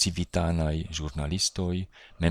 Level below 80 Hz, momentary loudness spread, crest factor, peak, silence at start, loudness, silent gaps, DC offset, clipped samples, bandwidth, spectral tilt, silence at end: -38 dBFS; 7 LU; 20 dB; -10 dBFS; 0 s; -29 LUFS; none; under 0.1%; under 0.1%; 15.5 kHz; -4.5 dB/octave; 0 s